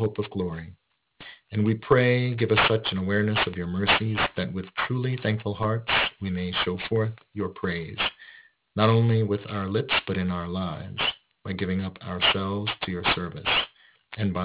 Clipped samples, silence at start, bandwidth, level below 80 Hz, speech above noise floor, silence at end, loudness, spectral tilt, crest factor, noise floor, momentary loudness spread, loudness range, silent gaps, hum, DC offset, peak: under 0.1%; 0 s; 4 kHz; -48 dBFS; 27 dB; 0 s; -25 LUFS; -9.5 dB/octave; 20 dB; -52 dBFS; 12 LU; 4 LU; none; none; under 0.1%; -6 dBFS